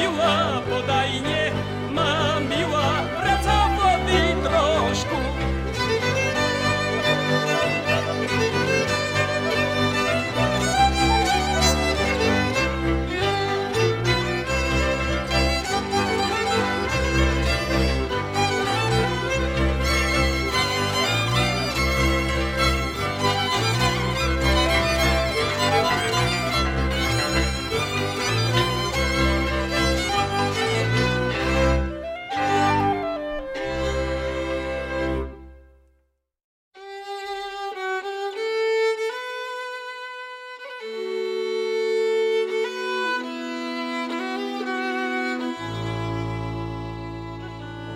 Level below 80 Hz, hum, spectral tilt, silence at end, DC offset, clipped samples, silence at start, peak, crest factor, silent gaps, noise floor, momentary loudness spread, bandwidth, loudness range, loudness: -32 dBFS; none; -4.5 dB/octave; 0 s; under 0.1%; under 0.1%; 0 s; -6 dBFS; 16 dB; 36.44-36.71 s; -69 dBFS; 10 LU; 16.5 kHz; 7 LU; -22 LUFS